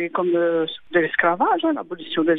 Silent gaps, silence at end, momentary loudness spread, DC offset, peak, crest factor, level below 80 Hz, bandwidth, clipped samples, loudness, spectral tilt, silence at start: none; 0 s; 6 LU; under 0.1%; -4 dBFS; 18 dB; -66 dBFS; 4 kHz; under 0.1%; -21 LUFS; -8.5 dB/octave; 0 s